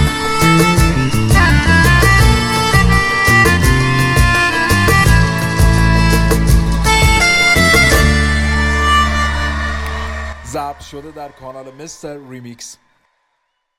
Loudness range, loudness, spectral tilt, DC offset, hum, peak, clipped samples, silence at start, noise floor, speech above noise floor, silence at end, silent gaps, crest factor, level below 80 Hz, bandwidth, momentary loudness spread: 15 LU; -11 LUFS; -4.5 dB/octave; under 0.1%; none; 0 dBFS; under 0.1%; 0 s; -68 dBFS; 37 dB; 1.05 s; none; 12 dB; -18 dBFS; 16.5 kHz; 21 LU